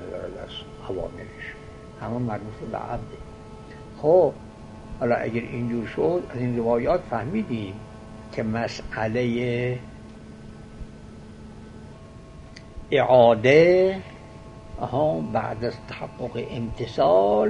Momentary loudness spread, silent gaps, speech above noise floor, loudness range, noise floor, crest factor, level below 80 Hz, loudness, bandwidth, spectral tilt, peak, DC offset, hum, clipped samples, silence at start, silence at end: 25 LU; none; 20 dB; 13 LU; -43 dBFS; 22 dB; -46 dBFS; -24 LUFS; 10.5 kHz; -7 dB/octave; -4 dBFS; under 0.1%; none; under 0.1%; 0 s; 0 s